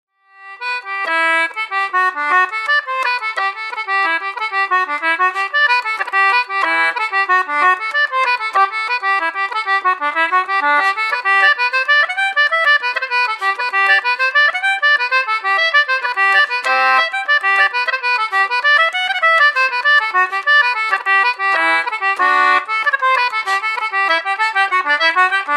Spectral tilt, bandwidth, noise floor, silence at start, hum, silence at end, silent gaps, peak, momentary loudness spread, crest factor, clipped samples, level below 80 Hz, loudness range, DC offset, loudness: 1 dB/octave; 13 kHz; -39 dBFS; 0.4 s; none; 0 s; none; -2 dBFS; 5 LU; 14 dB; under 0.1%; -84 dBFS; 3 LU; under 0.1%; -14 LUFS